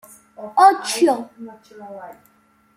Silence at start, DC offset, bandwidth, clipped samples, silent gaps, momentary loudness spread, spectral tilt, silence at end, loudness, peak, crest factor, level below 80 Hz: 0.4 s; under 0.1%; 16 kHz; under 0.1%; none; 24 LU; -2.5 dB/octave; 0.65 s; -17 LUFS; -2 dBFS; 20 dB; -72 dBFS